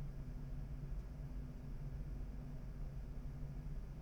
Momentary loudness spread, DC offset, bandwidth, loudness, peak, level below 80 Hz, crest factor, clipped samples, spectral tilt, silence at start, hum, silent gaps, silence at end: 2 LU; under 0.1%; 7.4 kHz; -50 LUFS; -34 dBFS; -48 dBFS; 12 dB; under 0.1%; -8.5 dB/octave; 0 s; none; none; 0 s